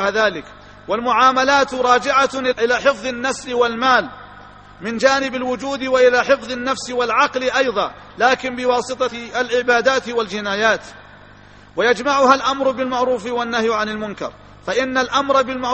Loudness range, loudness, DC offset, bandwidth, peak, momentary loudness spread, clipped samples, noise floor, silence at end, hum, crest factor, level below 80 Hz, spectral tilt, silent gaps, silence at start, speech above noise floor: 3 LU; -17 LUFS; under 0.1%; 8.8 kHz; 0 dBFS; 10 LU; under 0.1%; -44 dBFS; 0 s; 50 Hz at -50 dBFS; 18 dB; -50 dBFS; -3 dB/octave; none; 0 s; 26 dB